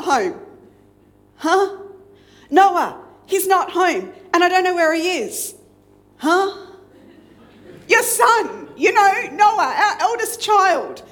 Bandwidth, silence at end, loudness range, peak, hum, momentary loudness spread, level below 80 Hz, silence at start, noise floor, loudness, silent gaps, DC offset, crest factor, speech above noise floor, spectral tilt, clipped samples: 19 kHz; 0.05 s; 5 LU; 0 dBFS; 50 Hz at -60 dBFS; 12 LU; -64 dBFS; 0 s; -52 dBFS; -17 LUFS; none; under 0.1%; 18 dB; 35 dB; -1.5 dB/octave; under 0.1%